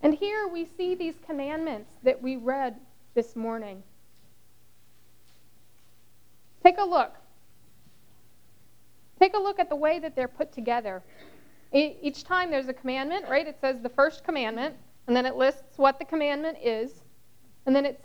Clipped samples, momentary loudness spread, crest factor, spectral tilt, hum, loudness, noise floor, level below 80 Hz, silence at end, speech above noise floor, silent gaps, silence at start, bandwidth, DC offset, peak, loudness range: under 0.1%; 11 LU; 28 dB; -5 dB/octave; none; -27 LUFS; -63 dBFS; -62 dBFS; 0.1 s; 37 dB; none; 0 s; over 20 kHz; 0.3%; 0 dBFS; 6 LU